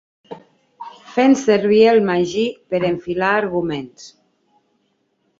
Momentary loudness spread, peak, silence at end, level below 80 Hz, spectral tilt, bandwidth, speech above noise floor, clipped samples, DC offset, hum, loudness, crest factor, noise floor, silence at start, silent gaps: 26 LU; -2 dBFS; 1.3 s; -58 dBFS; -5.5 dB/octave; 7.8 kHz; 50 dB; under 0.1%; under 0.1%; none; -17 LUFS; 16 dB; -66 dBFS; 0.3 s; none